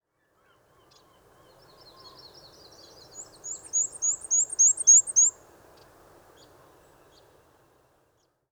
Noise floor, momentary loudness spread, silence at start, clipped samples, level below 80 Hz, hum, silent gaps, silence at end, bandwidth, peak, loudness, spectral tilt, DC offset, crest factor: -70 dBFS; 24 LU; 3.15 s; under 0.1%; -72 dBFS; none; none; 3.2 s; over 20 kHz; -8 dBFS; -19 LUFS; 1.5 dB/octave; under 0.1%; 20 dB